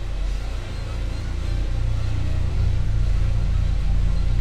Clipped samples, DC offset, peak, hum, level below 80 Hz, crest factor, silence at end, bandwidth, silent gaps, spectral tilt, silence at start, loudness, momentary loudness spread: under 0.1%; 0.5%; -10 dBFS; none; -22 dBFS; 10 dB; 0 s; 8.8 kHz; none; -6.5 dB/octave; 0 s; -26 LUFS; 6 LU